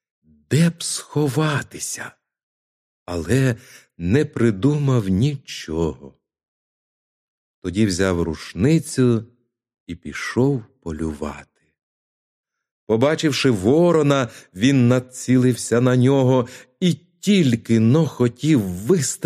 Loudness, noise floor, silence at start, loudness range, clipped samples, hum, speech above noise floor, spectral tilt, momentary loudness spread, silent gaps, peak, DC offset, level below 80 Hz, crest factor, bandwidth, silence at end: -20 LUFS; under -90 dBFS; 0.5 s; 7 LU; under 0.1%; none; over 71 dB; -6 dB/octave; 13 LU; 2.43-3.06 s, 6.48-7.62 s, 9.80-9.86 s, 11.83-12.44 s, 12.71-12.87 s; -4 dBFS; under 0.1%; -48 dBFS; 16 dB; 15 kHz; 0 s